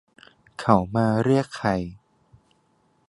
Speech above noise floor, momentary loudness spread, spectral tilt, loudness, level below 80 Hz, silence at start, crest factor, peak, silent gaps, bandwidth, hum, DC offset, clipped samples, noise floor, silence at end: 44 dB; 12 LU; -7.5 dB/octave; -23 LUFS; -50 dBFS; 0.6 s; 24 dB; -2 dBFS; none; 11.5 kHz; none; under 0.1%; under 0.1%; -65 dBFS; 1.15 s